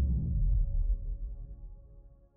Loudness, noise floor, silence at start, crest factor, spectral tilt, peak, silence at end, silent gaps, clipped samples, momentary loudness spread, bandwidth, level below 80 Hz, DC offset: -34 LUFS; -55 dBFS; 0 s; 12 dB; -17 dB/octave; -20 dBFS; 0.3 s; none; under 0.1%; 20 LU; 0.9 kHz; -32 dBFS; under 0.1%